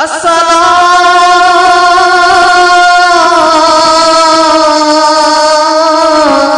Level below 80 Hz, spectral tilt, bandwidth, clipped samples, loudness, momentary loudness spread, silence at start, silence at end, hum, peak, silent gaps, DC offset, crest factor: -42 dBFS; -1.5 dB/octave; 12 kHz; 3%; -5 LUFS; 2 LU; 0 s; 0 s; none; 0 dBFS; none; 0.9%; 6 dB